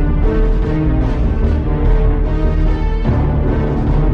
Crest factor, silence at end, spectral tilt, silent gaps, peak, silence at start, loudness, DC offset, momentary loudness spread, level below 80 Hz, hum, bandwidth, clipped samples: 10 dB; 0 s; -10 dB/octave; none; -4 dBFS; 0 s; -17 LUFS; under 0.1%; 2 LU; -14 dBFS; none; 5.2 kHz; under 0.1%